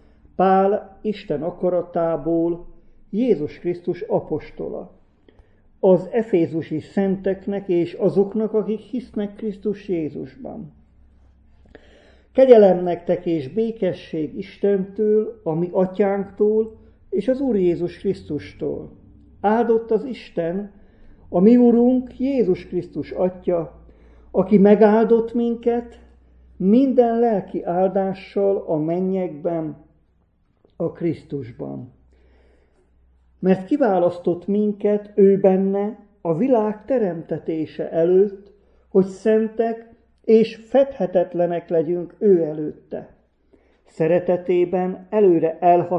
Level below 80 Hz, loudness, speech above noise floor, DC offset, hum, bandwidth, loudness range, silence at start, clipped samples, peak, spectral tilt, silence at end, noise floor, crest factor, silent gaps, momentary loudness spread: -54 dBFS; -20 LUFS; 43 dB; under 0.1%; none; 7.8 kHz; 7 LU; 0.4 s; under 0.1%; 0 dBFS; -9.5 dB/octave; 0 s; -62 dBFS; 20 dB; none; 13 LU